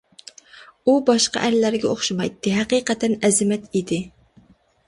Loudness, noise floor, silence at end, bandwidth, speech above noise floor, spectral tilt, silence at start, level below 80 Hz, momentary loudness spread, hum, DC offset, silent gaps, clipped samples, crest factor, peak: -20 LUFS; -54 dBFS; 0.8 s; 11.5 kHz; 34 dB; -4 dB/octave; 0.55 s; -58 dBFS; 7 LU; none; under 0.1%; none; under 0.1%; 18 dB; -4 dBFS